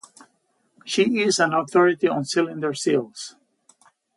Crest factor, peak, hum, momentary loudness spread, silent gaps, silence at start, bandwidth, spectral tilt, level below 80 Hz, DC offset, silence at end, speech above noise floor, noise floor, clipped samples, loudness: 18 dB; -6 dBFS; none; 17 LU; none; 0.85 s; 11.5 kHz; -4 dB/octave; -72 dBFS; under 0.1%; 0.85 s; 47 dB; -68 dBFS; under 0.1%; -21 LUFS